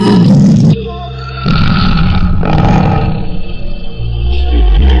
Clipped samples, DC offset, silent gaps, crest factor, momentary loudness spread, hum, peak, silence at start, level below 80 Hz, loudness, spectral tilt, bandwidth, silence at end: under 0.1%; under 0.1%; none; 8 dB; 16 LU; none; 0 dBFS; 0 s; -14 dBFS; -10 LUFS; -8 dB/octave; 9 kHz; 0 s